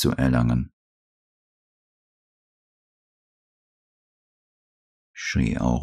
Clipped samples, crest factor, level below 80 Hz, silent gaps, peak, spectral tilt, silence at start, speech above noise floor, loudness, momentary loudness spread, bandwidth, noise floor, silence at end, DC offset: under 0.1%; 18 dB; -40 dBFS; 0.73-5.14 s; -10 dBFS; -6 dB/octave; 0 s; over 68 dB; -24 LUFS; 11 LU; 14 kHz; under -90 dBFS; 0 s; under 0.1%